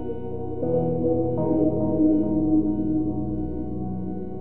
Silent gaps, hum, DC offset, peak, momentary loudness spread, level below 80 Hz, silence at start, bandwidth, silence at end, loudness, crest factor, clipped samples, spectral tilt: none; none; 2%; -10 dBFS; 10 LU; -42 dBFS; 0 s; 2.3 kHz; 0 s; -24 LUFS; 14 dB; under 0.1%; -13 dB/octave